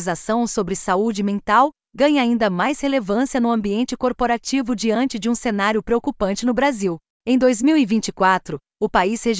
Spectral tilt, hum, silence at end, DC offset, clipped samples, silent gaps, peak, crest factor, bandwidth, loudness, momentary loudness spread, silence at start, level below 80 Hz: -4.5 dB/octave; none; 0 s; under 0.1%; under 0.1%; 7.10-7.20 s; -4 dBFS; 16 dB; 8 kHz; -20 LUFS; 6 LU; 0 s; -48 dBFS